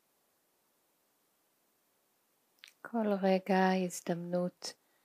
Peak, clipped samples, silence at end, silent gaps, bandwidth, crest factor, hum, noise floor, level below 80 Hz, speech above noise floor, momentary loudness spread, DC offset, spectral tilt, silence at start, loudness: -18 dBFS; under 0.1%; 0.3 s; none; 15.5 kHz; 20 dB; none; -76 dBFS; under -90 dBFS; 43 dB; 15 LU; under 0.1%; -6 dB/octave; 2.85 s; -33 LUFS